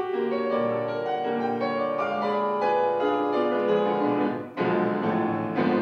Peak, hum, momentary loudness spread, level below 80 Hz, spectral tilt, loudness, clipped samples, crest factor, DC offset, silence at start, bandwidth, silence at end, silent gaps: -10 dBFS; none; 4 LU; -72 dBFS; -8 dB/octave; -25 LUFS; under 0.1%; 14 dB; under 0.1%; 0 s; 6.6 kHz; 0 s; none